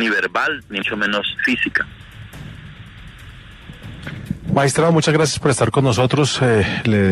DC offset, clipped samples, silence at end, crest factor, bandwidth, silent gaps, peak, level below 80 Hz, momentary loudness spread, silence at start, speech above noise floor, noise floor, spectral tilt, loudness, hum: under 0.1%; under 0.1%; 0 s; 16 dB; 13.5 kHz; none; -2 dBFS; -44 dBFS; 23 LU; 0 s; 22 dB; -39 dBFS; -5 dB/octave; -17 LUFS; none